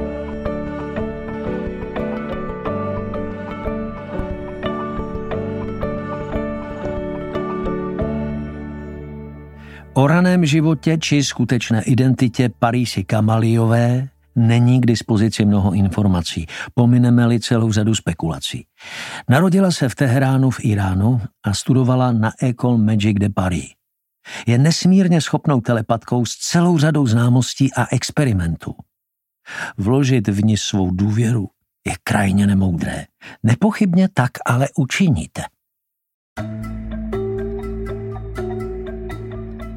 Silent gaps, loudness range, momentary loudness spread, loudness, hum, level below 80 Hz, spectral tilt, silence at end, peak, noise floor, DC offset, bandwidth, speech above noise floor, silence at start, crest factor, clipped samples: 36.14-36.36 s; 9 LU; 14 LU; -18 LUFS; none; -38 dBFS; -6.5 dB/octave; 0 s; -2 dBFS; -79 dBFS; under 0.1%; 14 kHz; 63 dB; 0 s; 16 dB; under 0.1%